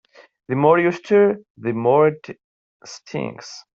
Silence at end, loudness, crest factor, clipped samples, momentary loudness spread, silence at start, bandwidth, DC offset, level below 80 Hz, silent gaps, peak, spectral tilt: 0.2 s; -18 LUFS; 18 dB; under 0.1%; 21 LU; 0.5 s; 7.6 kHz; under 0.1%; -64 dBFS; 1.50-1.55 s, 2.44-2.80 s; -2 dBFS; -7 dB/octave